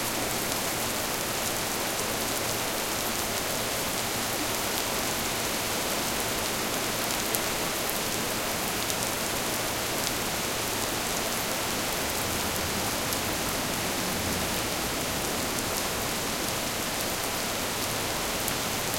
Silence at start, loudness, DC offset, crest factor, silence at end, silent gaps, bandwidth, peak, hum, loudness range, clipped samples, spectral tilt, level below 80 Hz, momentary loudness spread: 0 s; -28 LUFS; under 0.1%; 26 dB; 0 s; none; 17 kHz; -4 dBFS; none; 1 LU; under 0.1%; -2 dB/octave; -48 dBFS; 1 LU